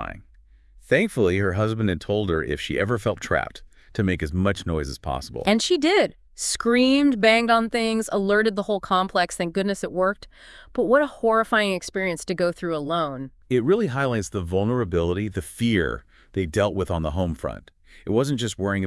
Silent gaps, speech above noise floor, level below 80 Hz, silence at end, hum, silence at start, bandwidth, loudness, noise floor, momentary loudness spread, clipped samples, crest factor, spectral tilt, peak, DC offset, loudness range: none; 30 dB; -46 dBFS; 0 s; none; 0 s; 12 kHz; -23 LUFS; -53 dBFS; 10 LU; under 0.1%; 20 dB; -5 dB/octave; -4 dBFS; under 0.1%; 5 LU